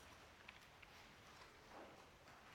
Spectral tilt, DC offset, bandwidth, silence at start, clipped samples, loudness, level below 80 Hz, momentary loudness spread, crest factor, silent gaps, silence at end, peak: -3.5 dB/octave; under 0.1%; 18 kHz; 0 s; under 0.1%; -62 LUFS; -76 dBFS; 3 LU; 24 dB; none; 0 s; -38 dBFS